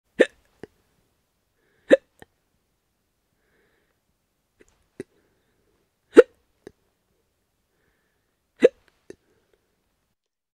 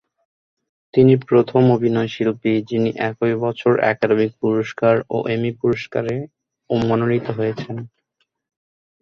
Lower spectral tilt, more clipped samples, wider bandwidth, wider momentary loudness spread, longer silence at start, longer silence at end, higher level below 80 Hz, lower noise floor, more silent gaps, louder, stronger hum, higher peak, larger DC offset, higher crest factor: second, -4.5 dB/octave vs -8.5 dB/octave; neither; first, 10.5 kHz vs 6.8 kHz; first, 27 LU vs 9 LU; second, 0.2 s vs 0.95 s; first, 1.85 s vs 1.15 s; second, -68 dBFS vs -56 dBFS; first, -78 dBFS vs -71 dBFS; neither; about the same, -20 LUFS vs -19 LUFS; neither; about the same, 0 dBFS vs -2 dBFS; neither; first, 28 dB vs 18 dB